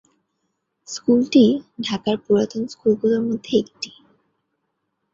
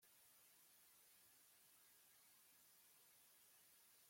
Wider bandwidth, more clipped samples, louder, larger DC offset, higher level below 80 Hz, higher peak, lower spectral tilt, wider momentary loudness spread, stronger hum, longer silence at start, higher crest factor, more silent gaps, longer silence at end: second, 7.6 kHz vs 16.5 kHz; neither; first, -20 LUFS vs -69 LUFS; neither; first, -62 dBFS vs under -90 dBFS; first, -4 dBFS vs -58 dBFS; first, -5.5 dB/octave vs 0 dB/octave; first, 15 LU vs 0 LU; neither; first, 0.9 s vs 0 s; about the same, 18 dB vs 14 dB; neither; first, 1.25 s vs 0 s